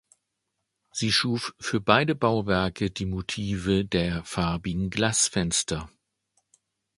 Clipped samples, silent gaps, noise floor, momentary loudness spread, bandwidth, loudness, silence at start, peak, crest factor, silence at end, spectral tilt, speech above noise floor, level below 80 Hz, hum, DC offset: under 0.1%; none; -81 dBFS; 8 LU; 11.5 kHz; -25 LUFS; 0.95 s; -2 dBFS; 26 dB; 1.1 s; -4 dB/octave; 55 dB; -46 dBFS; none; under 0.1%